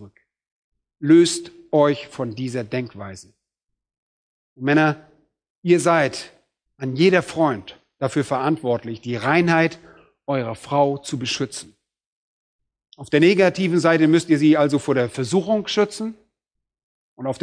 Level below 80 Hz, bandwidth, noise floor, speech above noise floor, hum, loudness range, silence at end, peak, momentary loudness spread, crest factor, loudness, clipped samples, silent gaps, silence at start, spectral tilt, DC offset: -64 dBFS; 10.5 kHz; -83 dBFS; 63 dB; none; 7 LU; 0.05 s; -2 dBFS; 15 LU; 18 dB; -20 LUFS; under 0.1%; 0.52-0.72 s, 3.98-4.56 s, 5.50-5.62 s, 12.06-12.59 s, 16.83-17.17 s; 0 s; -5.5 dB/octave; under 0.1%